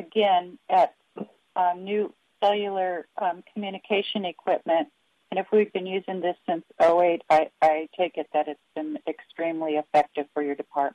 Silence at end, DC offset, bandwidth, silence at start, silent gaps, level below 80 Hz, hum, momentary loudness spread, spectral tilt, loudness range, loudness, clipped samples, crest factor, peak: 0.05 s; under 0.1%; 10 kHz; 0 s; none; -74 dBFS; none; 12 LU; -6 dB/octave; 4 LU; -26 LUFS; under 0.1%; 14 dB; -10 dBFS